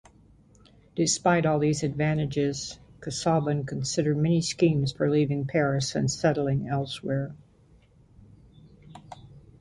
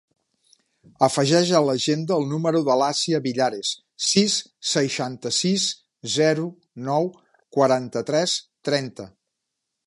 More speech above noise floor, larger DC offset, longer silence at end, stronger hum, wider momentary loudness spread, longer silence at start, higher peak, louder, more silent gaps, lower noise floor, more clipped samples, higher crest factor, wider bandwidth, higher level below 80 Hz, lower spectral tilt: second, 33 dB vs 59 dB; neither; second, 0.2 s vs 0.8 s; neither; first, 15 LU vs 9 LU; about the same, 0.95 s vs 1 s; second, -10 dBFS vs -4 dBFS; second, -26 LUFS vs -22 LUFS; neither; second, -58 dBFS vs -81 dBFS; neither; about the same, 18 dB vs 20 dB; about the same, 11.5 kHz vs 11.5 kHz; first, -56 dBFS vs -70 dBFS; first, -5.5 dB/octave vs -4 dB/octave